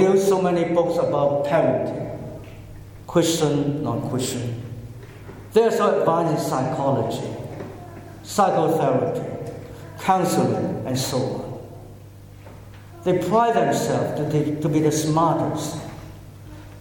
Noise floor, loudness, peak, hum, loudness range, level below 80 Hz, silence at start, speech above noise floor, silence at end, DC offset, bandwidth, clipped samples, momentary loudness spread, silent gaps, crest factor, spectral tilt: -42 dBFS; -22 LUFS; -4 dBFS; none; 4 LU; -50 dBFS; 0 s; 21 dB; 0 s; under 0.1%; 17.5 kHz; under 0.1%; 21 LU; none; 18 dB; -6 dB/octave